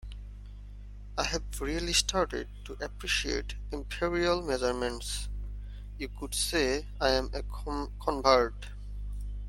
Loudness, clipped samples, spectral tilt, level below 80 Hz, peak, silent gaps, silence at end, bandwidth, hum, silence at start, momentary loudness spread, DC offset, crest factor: -31 LUFS; under 0.1%; -3 dB/octave; -40 dBFS; -6 dBFS; none; 0 s; 16.5 kHz; 50 Hz at -40 dBFS; 0 s; 18 LU; under 0.1%; 26 dB